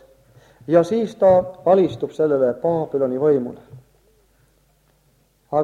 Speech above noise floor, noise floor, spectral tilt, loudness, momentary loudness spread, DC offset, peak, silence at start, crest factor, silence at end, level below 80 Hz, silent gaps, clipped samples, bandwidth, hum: 42 dB; -60 dBFS; -8 dB/octave; -19 LUFS; 7 LU; under 0.1%; -2 dBFS; 0.7 s; 18 dB; 0 s; -58 dBFS; none; under 0.1%; 9.4 kHz; none